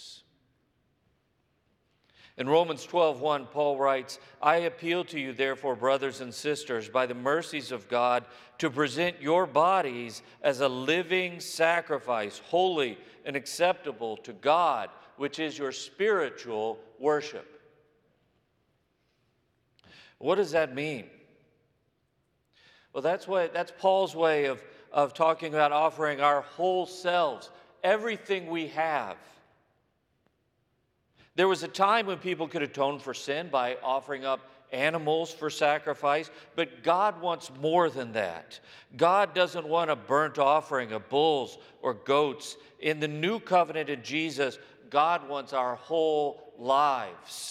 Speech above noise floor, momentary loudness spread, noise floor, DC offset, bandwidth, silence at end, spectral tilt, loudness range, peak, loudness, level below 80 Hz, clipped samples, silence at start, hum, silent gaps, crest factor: 46 dB; 10 LU; -74 dBFS; under 0.1%; 15 kHz; 0 s; -4.5 dB/octave; 7 LU; -8 dBFS; -28 LUFS; -80 dBFS; under 0.1%; 0 s; none; none; 22 dB